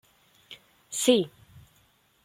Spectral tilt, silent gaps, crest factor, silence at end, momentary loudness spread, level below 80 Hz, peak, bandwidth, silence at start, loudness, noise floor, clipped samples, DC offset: -3 dB/octave; none; 24 dB; 1 s; 25 LU; -70 dBFS; -8 dBFS; 16.5 kHz; 0.5 s; -26 LUFS; -65 dBFS; under 0.1%; under 0.1%